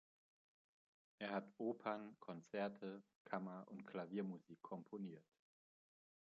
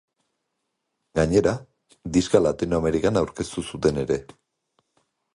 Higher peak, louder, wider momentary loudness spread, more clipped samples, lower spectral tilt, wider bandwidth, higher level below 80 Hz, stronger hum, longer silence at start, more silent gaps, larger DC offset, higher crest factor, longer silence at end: second, -28 dBFS vs -4 dBFS; second, -50 LUFS vs -23 LUFS; about the same, 9 LU vs 10 LU; neither; about the same, -5.5 dB/octave vs -6 dB/octave; second, 7.4 kHz vs 11.5 kHz; second, under -90 dBFS vs -44 dBFS; neither; about the same, 1.2 s vs 1.15 s; first, 3.16-3.25 s vs none; neither; about the same, 22 dB vs 22 dB; about the same, 1 s vs 1.1 s